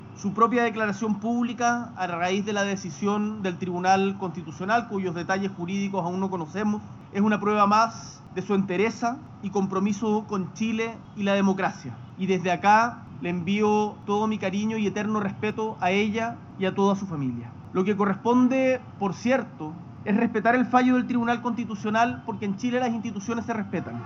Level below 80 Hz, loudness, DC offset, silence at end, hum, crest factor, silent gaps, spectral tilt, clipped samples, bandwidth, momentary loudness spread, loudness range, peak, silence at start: -64 dBFS; -25 LUFS; under 0.1%; 0 s; none; 20 dB; none; -5 dB/octave; under 0.1%; 7.4 kHz; 10 LU; 3 LU; -4 dBFS; 0 s